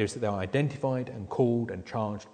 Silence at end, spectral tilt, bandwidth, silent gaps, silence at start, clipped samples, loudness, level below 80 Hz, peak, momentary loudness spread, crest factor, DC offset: 0.05 s; -7 dB/octave; 9.4 kHz; none; 0 s; under 0.1%; -30 LUFS; -60 dBFS; -12 dBFS; 7 LU; 18 dB; under 0.1%